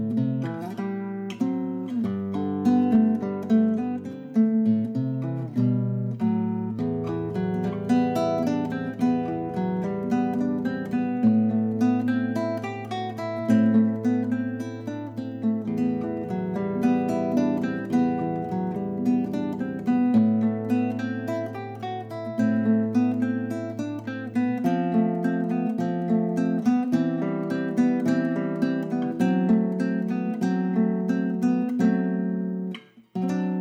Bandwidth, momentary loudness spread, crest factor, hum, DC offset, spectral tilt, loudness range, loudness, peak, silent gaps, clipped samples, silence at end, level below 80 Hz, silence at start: 8.6 kHz; 9 LU; 12 dB; none; under 0.1%; -8.5 dB/octave; 2 LU; -25 LUFS; -12 dBFS; none; under 0.1%; 0 s; -64 dBFS; 0 s